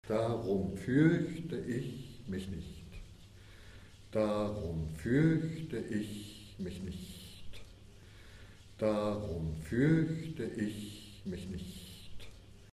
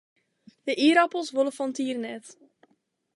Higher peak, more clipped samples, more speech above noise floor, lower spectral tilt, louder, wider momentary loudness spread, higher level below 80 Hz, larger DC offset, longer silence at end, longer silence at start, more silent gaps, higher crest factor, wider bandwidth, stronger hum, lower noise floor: second, -16 dBFS vs -8 dBFS; neither; second, 21 dB vs 46 dB; first, -7.5 dB/octave vs -3 dB/octave; second, -35 LUFS vs -25 LUFS; first, 25 LU vs 17 LU; first, -54 dBFS vs -86 dBFS; neither; second, 0.05 s vs 0.85 s; second, 0.05 s vs 0.65 s; neither; about the same, 20 dB vs 20 dB; first, 13.5 kHz vs 11.5 kHz; neither; second, -55 dBFS vs -71 dBFS